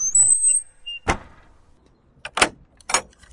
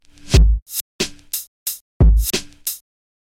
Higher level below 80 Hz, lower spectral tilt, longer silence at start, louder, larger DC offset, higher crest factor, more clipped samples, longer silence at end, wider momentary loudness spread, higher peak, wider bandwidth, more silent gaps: second, -44 dBFS vs -20 dBFS; second, -0.5 dB/octave vs -4.5 dB/octave; second, 0 s vs 0.25 s; about the same, -19 LUFS vs -20 LUFS; neither; first, 22 dB vs 16 dB; neither; second, 0.3 s vs 0.55 s; first, 19 LU vs 11 LU; about the same, 0 dBFS vs -2 dBFS; second, 11.5 kHz vs 17 kHz; second, none vs 0.62-0.66 s, 0.81-0.99 s, 1.47-1.66 s, 1.81-2.00 s